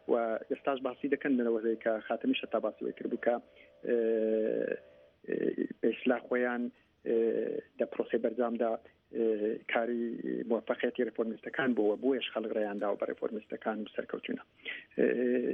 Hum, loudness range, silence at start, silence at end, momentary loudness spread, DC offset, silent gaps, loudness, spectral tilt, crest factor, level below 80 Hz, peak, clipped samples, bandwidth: none; 1 LU; 0.1 s; 0 s; 9 LU; under 0.1%; none; -33 LUFS; -8 dB/octave; 18 dB; -78 dBFS; -14 dBFS; under 0.1%; 3.8 kHz